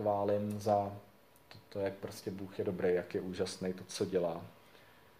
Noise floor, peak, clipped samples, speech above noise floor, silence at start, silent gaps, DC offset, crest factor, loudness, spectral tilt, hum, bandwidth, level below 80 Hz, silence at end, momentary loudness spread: -61 dBFS; -18 dBFS; under 0.1%; 25 dB; 0 s; none; under 0.1%; 20 dB; -37 LUFS; -6 dB/octave; none; 15.5 kHz; -72 dBFS; 0.4 s; 11 LU